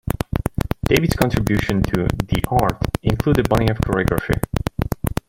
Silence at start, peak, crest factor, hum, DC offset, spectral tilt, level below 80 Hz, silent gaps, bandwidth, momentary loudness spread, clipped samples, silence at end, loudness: 0.05 s; 0 dBFS; 20 dB; none; under 0.1%; -6.5 dB/octave; -30 dBFS; none; 17 kHz; 7 LU; under 0.1%; 0.15 s; -20 LUFS